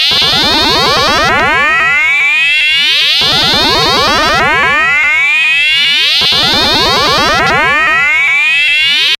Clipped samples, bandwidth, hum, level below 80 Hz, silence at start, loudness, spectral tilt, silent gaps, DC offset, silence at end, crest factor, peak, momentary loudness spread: under 0.1%; 16.5 kHz; none; -34 dBFS; 0 s; -7 LUFS; -2 dB/octave; none; under 0.1%; 0.05 s; 8 dB; -2 dBFS; 2 LU